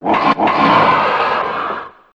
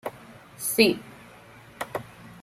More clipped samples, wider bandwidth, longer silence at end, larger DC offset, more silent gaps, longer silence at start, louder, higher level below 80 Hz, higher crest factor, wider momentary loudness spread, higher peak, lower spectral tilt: neither; second, 8.4 kHz vs 16 kHz; first, 0.25 s vs 0 s; neither; neither; about the same, 0 s vs 0.05 s; first, -14 LUFS vs -25 LUFS; first, -50 dBFS vs -64 dBFS; second, 14 dB vs 26 dB; second, 11 LU vs 27 LU; first, 0 dBFS vs -4 dBFS; first, -6 dB/octave vs -3 dB/octave